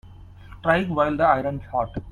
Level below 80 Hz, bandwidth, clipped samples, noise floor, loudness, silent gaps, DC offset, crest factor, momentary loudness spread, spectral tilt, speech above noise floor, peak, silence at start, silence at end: -44 dBFS; 10.5 kHz; under 0.1%; -43 dBFS; -22 LUFS; none; under 0.1%; 18 dB; 8 LU; -8 dB/octave; 21 dB; -6 dBFS; 0.05 s; 0 s